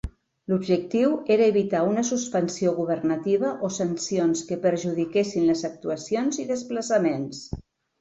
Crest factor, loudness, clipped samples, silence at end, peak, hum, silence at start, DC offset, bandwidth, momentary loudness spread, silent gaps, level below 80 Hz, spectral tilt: 16 dB; -24 LUFS; under 0.1%; 0.4 s; -8 dBFS; none; 0.05 s; under 0.1%; 8.2 kHz; 9 LU; none; -50 dBFS; -5.5 dB/octave